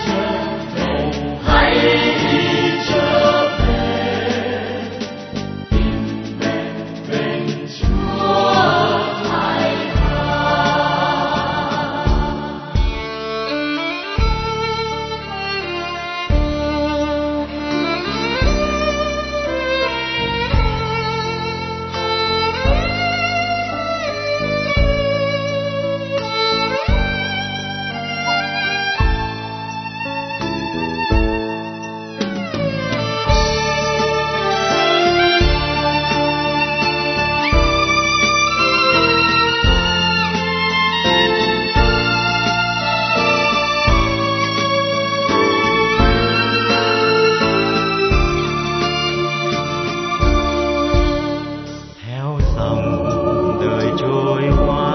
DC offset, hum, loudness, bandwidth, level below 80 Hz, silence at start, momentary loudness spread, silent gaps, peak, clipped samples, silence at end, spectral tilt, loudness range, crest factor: under 0.1%; none; -17 LUFS; 6.4 kHz; -26 dBFS; 0 s; 9 LU; none; 0 dBFS; under 0.1%; 0 s; -5 dB/octave; 6 LU; 18 dB